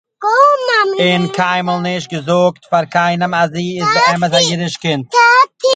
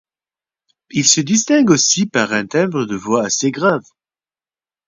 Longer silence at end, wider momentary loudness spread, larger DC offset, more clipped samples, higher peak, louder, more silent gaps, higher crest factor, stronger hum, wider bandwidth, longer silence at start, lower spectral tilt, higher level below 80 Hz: second, 0 s vs 1.05 s; about the same, 8 LU vs 7 LU; neither; neither; about the same, 0 dBFS vs 0 dBFS; about the same, -13 LUFS vs -15 LUFS; neither; about the same, 14 dB vs 18 dB; neither; first, 9.4 kHz vs 7.8 kHz; second, 0.2 s vs 0.95 s; about the same, -4 dB/octave vs -3 dB/octave; about the same, -58 dBFS vs -60 dBFS